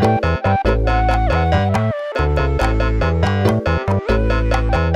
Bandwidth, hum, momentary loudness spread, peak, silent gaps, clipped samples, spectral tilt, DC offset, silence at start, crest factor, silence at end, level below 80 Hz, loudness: 11 kHz; none; 2 LU; -2 dBFS; none; under 0.1%; -7.5 dB/octave; under 0.1%; 0 s; 12 dB; 0 s; -22 dBFS; -17 LUFS